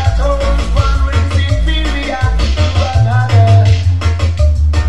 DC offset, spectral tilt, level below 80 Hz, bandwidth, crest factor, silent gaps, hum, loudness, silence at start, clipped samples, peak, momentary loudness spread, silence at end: 4%; -6 dB/octave; -14 dBFS; 10 kHz; 10 dB; none; none; -13 LUFS; 0 s; under 0.1%; 0 dBFS; 6 LU; 0 s